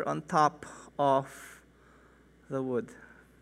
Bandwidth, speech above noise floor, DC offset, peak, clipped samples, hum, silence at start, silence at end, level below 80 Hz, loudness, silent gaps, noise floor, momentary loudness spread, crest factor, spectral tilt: 15.5 kHz; 29 dB; under 0.1%; -10 dBFS; under 0.1%; none; 0 s; 0.35 s; -66 dBFS; -30 LUFS; none; -60 dBFS; 21 LU; 22 dB; -6 dB/octave